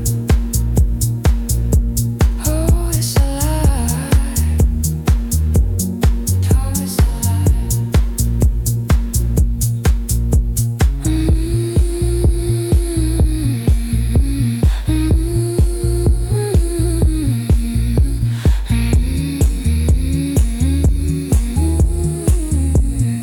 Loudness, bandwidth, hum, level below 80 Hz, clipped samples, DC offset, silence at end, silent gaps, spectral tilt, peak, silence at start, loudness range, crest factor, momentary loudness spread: -17 LUFS; 18 kHz; none; -18 dBFS; under 0.1%; under 0.1%; 0 s; none; -6 dB/octave; -2 dBFS; 0 s; 1 LU; 12 dB; 2 LU